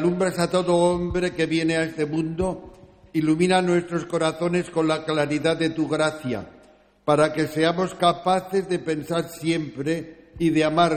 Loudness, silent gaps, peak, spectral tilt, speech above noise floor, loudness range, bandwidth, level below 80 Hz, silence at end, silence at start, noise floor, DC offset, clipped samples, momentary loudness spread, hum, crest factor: -23 LUFS; none; -6 dBFS; -5.5 dB/octave; 32 dB; 1 LU; 16 kHz; -50 dBFS; 0 s; 0 s; -54 dBFS; under 0.1%; under 0.1%; 8 LU; none; 16 dB